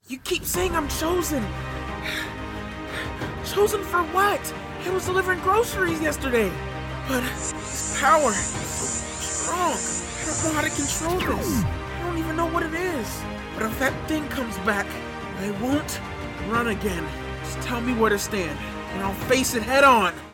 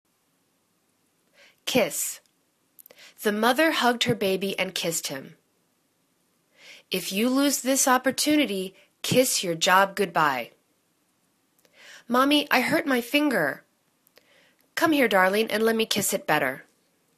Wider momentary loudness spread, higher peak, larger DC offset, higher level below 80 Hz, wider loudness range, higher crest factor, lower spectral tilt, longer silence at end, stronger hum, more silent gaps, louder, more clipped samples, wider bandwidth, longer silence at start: about the same, 10 LU vs 12 LU; about the same, -4 dBFS vs -4 dBFS; neither; first, -40 dBFS vs -70 dBFS; about the same, 4 LU vs 6 LU; about the same, 20 dB vs 22 dB; about the same, -3.5 dB/octave vs -3 dB/octave; second, 0 s vs 0.55 s; neither; neither; about the same, -24 LUFS vs -23 LUFS; neither; first, 18 kHz vs 14 kHz; second, 0.05 s vs 1.65 s